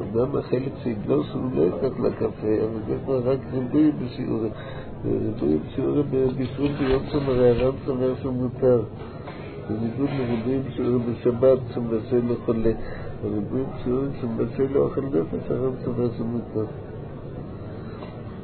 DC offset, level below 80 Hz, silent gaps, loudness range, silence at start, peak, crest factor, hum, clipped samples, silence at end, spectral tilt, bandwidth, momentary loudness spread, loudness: under 0.1%; -44 dBFS; none; 3 LU; 0 s; -8 dBFS; 16 dB; none; under 0.1%; 0 s; -12.5 dB/octave; 4.5 kHz; 15 LU; -24 LUFS